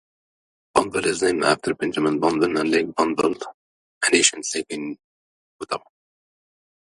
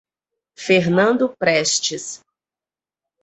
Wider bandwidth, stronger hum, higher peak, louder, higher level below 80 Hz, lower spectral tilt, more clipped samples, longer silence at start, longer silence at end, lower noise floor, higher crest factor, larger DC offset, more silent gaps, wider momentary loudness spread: first, 11.5 kHz vs 8.4 kHz; neither; about the same, -2 dBFS vs -4 dBFS; second, -21 LUFS vs -17 LUFS; about the same, -60 dBFS vs -62 dBFS; about the same, -2.5 dB/octave vs -3.5 dB/octave; neither; first, 0.75 s vs 0.6 s; about the same, 1.1 s vs 1.05 s; about the same, under -90 dBFS vs under -90 dBFS; about the same, 22 dB vs 18 dB; neither; first, 3.54-4.01 s, 5.04-5.59 s vs none; about the same, 14 LU vs 16 LU